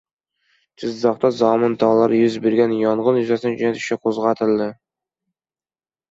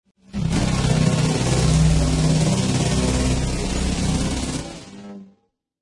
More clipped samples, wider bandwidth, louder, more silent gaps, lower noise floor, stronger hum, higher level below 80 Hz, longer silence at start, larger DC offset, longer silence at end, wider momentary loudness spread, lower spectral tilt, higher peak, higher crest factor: neither; second, 7.8 kHz vs 11.5 kHz; about the same, -18 LUFS vs -20 LUFS; neither; first, under -90 dBFS vs -64 dBFS; neither; second, -64 dBFS vs -28 dBFS; first, 0.8 s vs 0.35 s; neither; first, 1.4 s vs 0.55 s; second, 6 LU vs 16 LU; about the same, -6.5 dB/octave vs -5.5 dB/octave; about the same, -4 dBFS vs -6 dBFS; about the same, 16 dB vs 14 dB